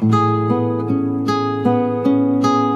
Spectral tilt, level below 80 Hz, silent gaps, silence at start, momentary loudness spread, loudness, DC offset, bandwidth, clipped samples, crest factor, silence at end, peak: -8 dB/octave; -62 dBFS; none; 0 s; 3 LU; -17 LUFS; under 0.1%; 8 kHz; under 0.1%; 14 dB; 0 s; -2 dBFS